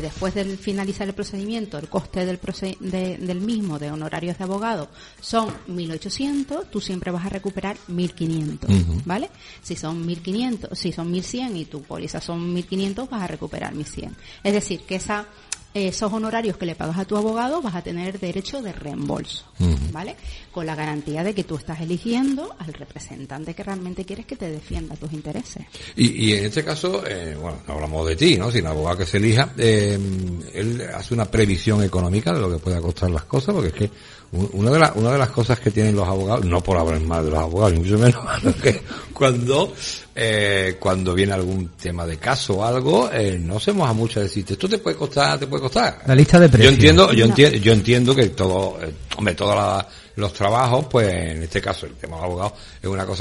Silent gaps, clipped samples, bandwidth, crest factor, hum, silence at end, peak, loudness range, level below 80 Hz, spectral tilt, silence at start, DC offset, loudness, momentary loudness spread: none; under 0.1%; 11.5 kHz; 20 dB; none; 0 s; 0 dBFS; 13 LU; -38 dBFS; -5.5 dB/octave; 0 s; under 0.1%; -21 LUFS; 15 LU